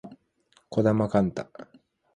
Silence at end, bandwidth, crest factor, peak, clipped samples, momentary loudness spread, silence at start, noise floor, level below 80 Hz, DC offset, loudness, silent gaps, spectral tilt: 0.5 s; 9.6 kHz; 20 dB; -8 dBFS; under 0.1%; 20 LU; 0.05 s; -65 dBFS; -58 dBFS; under 0.1%; -25 LUFS; none; -8.5 dB/octave